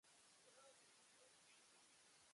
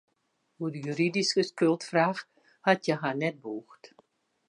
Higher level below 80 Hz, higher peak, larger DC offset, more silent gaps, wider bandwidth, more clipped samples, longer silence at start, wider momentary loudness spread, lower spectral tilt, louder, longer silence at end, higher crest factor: second, under -90 dBFS vs -82 dBFS; second, -58 dBFS vs -8 dBFS; neither; neither; about the same, 11.5 kHz vs 11 kHz; neither; second, 0.05 s vs 0.6 s; second, 1 LU vs 13 LU; second, -0.5 dB/octave vs -5 dB/octave; second, -69 LUFS vs -28 LUFS; second, 0 s vs 0.75 s; second, 14 dB vs 22 dB